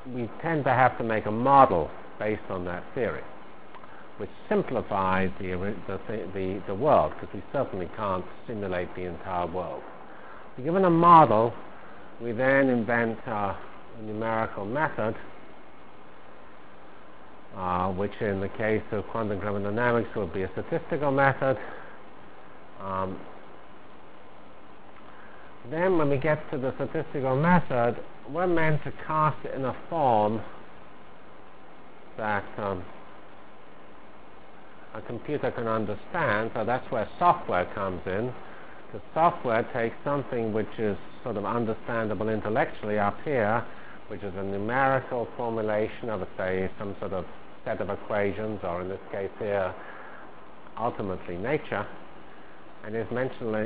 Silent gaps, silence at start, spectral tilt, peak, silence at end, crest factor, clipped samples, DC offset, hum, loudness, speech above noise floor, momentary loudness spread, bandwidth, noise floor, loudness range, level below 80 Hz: none; 0 s; -10.5 dB/octave; -2 dBFS; 0 s; 26 dB; under 0.1%; 1%; none; -27 LUFS; 23 dB; 21 LU; 4 kHz; -50 dBFS; 12 LU; -54 dBFS